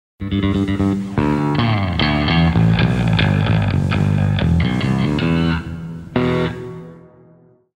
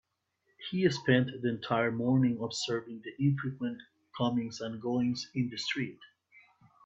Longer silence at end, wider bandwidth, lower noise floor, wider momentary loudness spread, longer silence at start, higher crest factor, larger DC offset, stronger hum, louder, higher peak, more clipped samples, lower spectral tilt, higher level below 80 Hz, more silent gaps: first, 0.8 s vs 0.45 s; first, 9.8 kHz vs 8 kHz; second, -50 dBFS vs -77 dBFS; about the same, 9 LU vs 11 LU; second, 0.2 s vs 0.6 s; second, 14 dB vs 20 dB; neither; neither; first, -17 LUFS vs -32 LUFS; first, -2 dBFS vs -12 dBFS; neither; first, -7.5 dB/octave vs -6 dB/octave; first, -32 dBFS vs -70 dBFS; neither